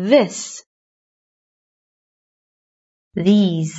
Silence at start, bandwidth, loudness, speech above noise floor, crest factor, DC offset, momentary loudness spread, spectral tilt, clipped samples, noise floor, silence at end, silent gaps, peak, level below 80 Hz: 0 s; 8 kHz; -17 LUFS; over 74 dB; 20 dB; under 0.1%; 16 LU; -6 dB/octave; under 0.1%; under -90 dBFS; 0 s; 0.66-3.11 s; -2 dBFS; -64 dBFS